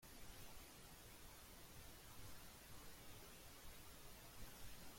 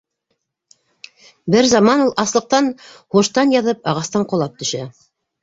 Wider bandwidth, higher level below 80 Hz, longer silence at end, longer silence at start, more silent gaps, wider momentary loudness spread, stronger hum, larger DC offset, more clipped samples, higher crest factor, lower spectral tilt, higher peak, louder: first, 16.5 kHz vs 8 kHz; second, -66 dBFS vs -58 dBFS; second, 0 s vs 0.5 s; second, 0 s vs 1.45 s; neither; second, 1 LU vs 12 LU; neither; neither; neither; about the same, 16 dB vs 16 dB; second, -3 dB/octave vs -4.5 dB/octave; second, -42 dBFS vs -2 dBFS; second, -60 LUFS vs -16 LUFS